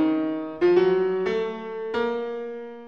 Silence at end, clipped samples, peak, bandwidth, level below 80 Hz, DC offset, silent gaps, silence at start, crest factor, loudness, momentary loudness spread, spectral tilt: 0 s; under 0.1%; -8 dBFS; 6.4 kHz; -62 dBFS; 0.2%; none; 0 s; 16 dB; -24 LUFS; 12 LU; -7.5 dB/octave